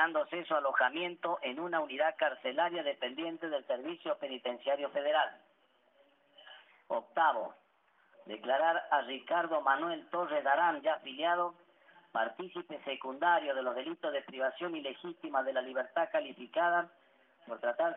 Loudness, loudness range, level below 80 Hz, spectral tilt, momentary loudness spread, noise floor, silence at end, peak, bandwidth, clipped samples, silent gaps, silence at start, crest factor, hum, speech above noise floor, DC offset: -34 LUFS; 4 LU; under -90 dBFS; 3 dB/octave; 10 LU; -70 dBFS; 0 s; -16 dBFS; 3.9 kHz; under 0.1%; none; 0 s; 20 dB; none; 37 dB; under 0.1%